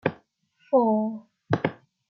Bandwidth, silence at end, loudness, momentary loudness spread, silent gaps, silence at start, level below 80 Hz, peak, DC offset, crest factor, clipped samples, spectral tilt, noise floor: 6.4 kHz; 0.35 s; -26 LUFS; 10 LU; none; 0.05 s; -68 dBFS; -6 dBFS; under 0.1%; 20 dB; under 0.1%; -9 dB/octave; -65 dBFS